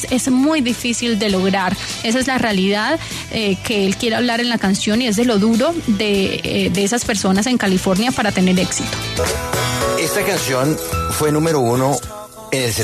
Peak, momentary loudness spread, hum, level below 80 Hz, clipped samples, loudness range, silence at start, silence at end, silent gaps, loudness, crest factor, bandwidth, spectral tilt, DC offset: -4 dBFS; 5 LU; none; -40 dBFS; under 0.1%; 1 LU; 0 s; 0 s; none; -17 LUFS; 14 dB; 13.5 kHz; -4 dB/octave; under 0.1%